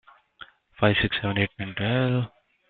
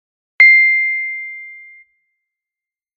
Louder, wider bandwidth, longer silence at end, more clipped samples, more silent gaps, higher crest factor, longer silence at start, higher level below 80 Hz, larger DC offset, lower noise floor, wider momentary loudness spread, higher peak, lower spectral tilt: second, -25 LUFS vs -10 LUFS; second, 4.6 kHz vs 6.6 kHz; second, 0.4 s vs 1.4 s; neither; neither; about the same, 20 dB vs 16 dB; about the same, 0.4 s vs 0.4 s; first, -50 dBFS vs -74 dBFS; neither; second, -50 dBFS vs -89 dBFS; second, 7 LU vs 21 LU; second, -6 dBFS vs 0 dBFS; first, -10.5 dB/octave vs 5.5 dB/octave